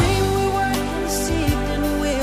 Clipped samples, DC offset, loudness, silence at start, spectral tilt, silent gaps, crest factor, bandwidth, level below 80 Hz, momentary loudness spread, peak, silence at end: under 0.1%; under 0.1%; -21 LUFS; 0 s; -5 dB/octave; none; 14 dB; 15.5 kHz; -28 dBFS; 3 LU; -6 dBFS; 0 s